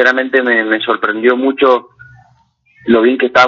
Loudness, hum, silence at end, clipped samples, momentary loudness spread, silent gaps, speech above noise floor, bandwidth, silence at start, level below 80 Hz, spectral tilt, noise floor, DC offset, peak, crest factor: -12 LUFS; none; 0 s; under 0.1%; 4 LU; none; 42 dB; 7.2 kHz; 0 s; -56 dBFS; -5 dB/octave; -53 dBFS; under 0.1%; 0 dBFS; 12 dB